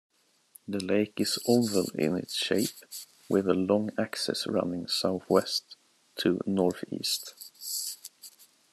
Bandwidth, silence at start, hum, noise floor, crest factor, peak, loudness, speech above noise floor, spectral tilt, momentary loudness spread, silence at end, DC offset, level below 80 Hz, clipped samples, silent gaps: 13.5 kHz; 0.7 s; none; -59 dBFS; 22 dB; -8 dBFS; -29 LUFS; 31 dB; -4 dB/octave; 17 LU; 0.45 s; under 0.1%; -74 dBFS; under 0.1%; none